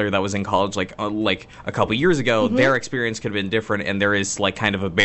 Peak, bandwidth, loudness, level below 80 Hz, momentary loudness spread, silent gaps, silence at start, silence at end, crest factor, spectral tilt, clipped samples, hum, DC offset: -2 dBFS; 8.4 kHz; -21 LUFS; -50 dBFS; 7 LU; none; 0 s; 0 s; 18 dB; -4.5 dB/octave; under 0.1%; none; under 0.1%